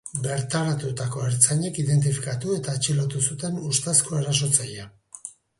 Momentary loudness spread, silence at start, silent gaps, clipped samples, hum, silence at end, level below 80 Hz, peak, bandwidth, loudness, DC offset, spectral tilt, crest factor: 15 LU; 0.05 s; none; under 0.1%; none; 0.3 s; -58 dBFS; -2 dBFS; 11.5 kHz; -23 LUFS; under 0.1%; -4 dB/octave; 22 dB